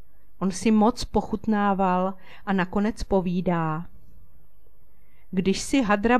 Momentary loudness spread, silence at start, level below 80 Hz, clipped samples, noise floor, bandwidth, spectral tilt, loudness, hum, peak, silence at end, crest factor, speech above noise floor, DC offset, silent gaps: 9 LU; 0.4 s; -44 dBFS; under 0.1%; -58 dBFS; 12.5 kHz; -6 dB/octave; -25 LUFS; none; -8 dBFS; 0 s; 16 dB; 35 dB; 2%; none